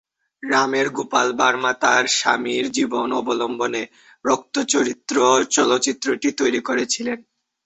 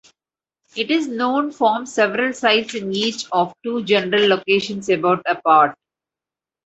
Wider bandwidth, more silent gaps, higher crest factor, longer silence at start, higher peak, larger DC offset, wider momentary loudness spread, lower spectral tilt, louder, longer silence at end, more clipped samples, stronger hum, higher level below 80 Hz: about the same, 8.4 kHz vs 8.2 kHz; neither; about the same, 18 dB vs 18 dB; second, 0.45 s vs 0.75 s; about the same, -2 dBFS vs -2 dBFS; neither; about the same, 7 LU vs 6 LU; second, -2 dB/octave vs -4 dB/octave; about the same, -20 LUFS vs -18 LUFS; second, 0.45 s vs 0.9 s; neither; neither; about the same, -64 dBFS vs -66 dBFS